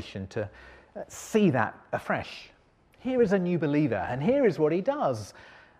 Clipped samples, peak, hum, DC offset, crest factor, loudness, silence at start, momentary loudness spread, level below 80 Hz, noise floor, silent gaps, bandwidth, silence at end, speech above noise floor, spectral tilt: under 0.1%; -10 dBFS; none; under 0.1%; 18 dB; -27 LUFS; 0 s; 17 LU; -60 dBFS; -60 dBFS; none; 15.5 kHz; 0.35 s; 33 dB; -7 dB/octave